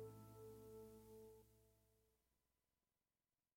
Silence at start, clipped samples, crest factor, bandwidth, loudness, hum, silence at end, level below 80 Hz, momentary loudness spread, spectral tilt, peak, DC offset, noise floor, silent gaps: 0 s; under 0.1%; 18 dB; 16.5 kHz; -62 LUFS; none; 1.4 s; -80 dBFS; 4 LU; -6.5 dB/octave; -46 dBFS; under 0.1%; under -90 dBFS; none